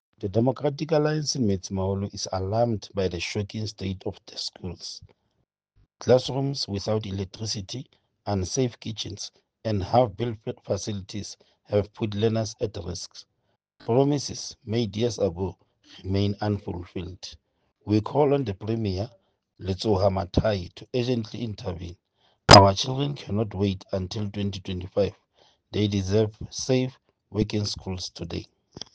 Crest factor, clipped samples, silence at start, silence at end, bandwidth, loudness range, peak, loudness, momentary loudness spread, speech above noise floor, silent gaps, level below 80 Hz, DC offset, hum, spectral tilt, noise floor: 26 dB; under 0.1%; 0.2 s; 0.15 s; 9.8 kHz; 9 LU; 0 dBFS; -26 LUFS; 14 LU; 49 dB; none; -48 dBFS; under 0.1%; none; -5 dB/octave; -75 dBFS